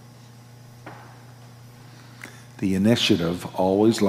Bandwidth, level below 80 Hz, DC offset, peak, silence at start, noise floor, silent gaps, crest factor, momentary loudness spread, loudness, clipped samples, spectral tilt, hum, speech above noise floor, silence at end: 16 kHz; -64 dBFS; under 0.1%; -6 dBFS; 0.85 s; -46 dBFS; none; 20 dB; 26 LU; -22 LUFS; under 0.1%; -5.5 dB/octave; 60 Hz at -45 dBFS; 25 dB; 0 s